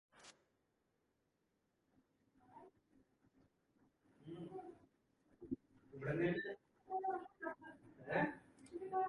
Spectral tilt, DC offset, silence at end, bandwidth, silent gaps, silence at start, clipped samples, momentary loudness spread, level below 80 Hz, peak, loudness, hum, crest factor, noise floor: -7.5 dB/octave; under 0.1%; 0 s; 11 kHz; none; 0.15 s; under 0.1%; 22 LU; -78 dBFS; -26 dBFS; -45 LUFS; none; 22 dB; -84 dBFS